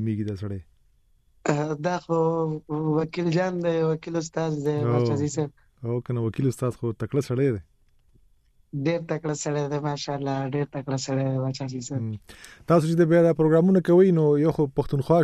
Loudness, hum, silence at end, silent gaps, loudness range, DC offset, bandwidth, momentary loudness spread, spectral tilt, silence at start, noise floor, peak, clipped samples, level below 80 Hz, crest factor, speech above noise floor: -25 LUFS; none; 0 s; none; 8 LU; under 0.1%; 12.5 kHz; 12 LU; -7 dB/octave; 0 s; -61 dBFS; -8 dBFS; under 0.1%; -54 dBFS; 18 dB; 38 dB